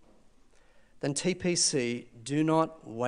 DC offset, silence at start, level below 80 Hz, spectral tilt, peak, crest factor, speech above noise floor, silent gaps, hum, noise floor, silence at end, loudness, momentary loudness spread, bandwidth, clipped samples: under 0.1%; 0.95 s; -64 dBFS; -4 dB/octave; -12 dBFS; 20 dB; 29 dB; none; none; -59 dBFS; 0 s; -29 LUFS; 9 LU; 10.5 kHz; under 0.1%